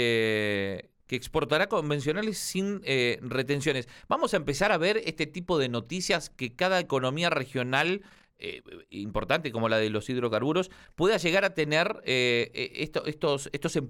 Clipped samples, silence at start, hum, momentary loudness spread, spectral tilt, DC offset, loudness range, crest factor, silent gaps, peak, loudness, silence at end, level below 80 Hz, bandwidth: under 0.1%; 0 s; none; 10 LU; -4.5 dB/octave; under 0.1%; 2 LU; 18 dB; none; -10 dBFS; -28 LUFS; 0 s; -54 dBFS; 17 kHz